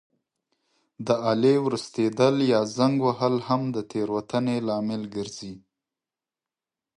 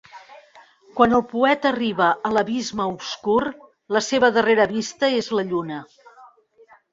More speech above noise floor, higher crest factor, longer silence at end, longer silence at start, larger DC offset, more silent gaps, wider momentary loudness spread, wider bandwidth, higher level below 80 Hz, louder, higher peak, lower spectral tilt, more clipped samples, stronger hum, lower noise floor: first, over 66 dB vs 33 dB; about the same, 20 dB vs 20 dB; first, 1.4 s vs 0.65 s; first, 1 s vs 0.15 s; neither; neither; first, 12 LU vs 9 LU; first, 11 kHz vs 7.8 kHz; second, -68 dBFS vs -58 dBFS; second, -24 LUFS vs -21 LUFS; second, -6 dBFS vs -2 dBFS; first, -6.5 dB/octave vs -4 dB/octave; neither; neither; first, under -90 dBFS vs -53 dBFS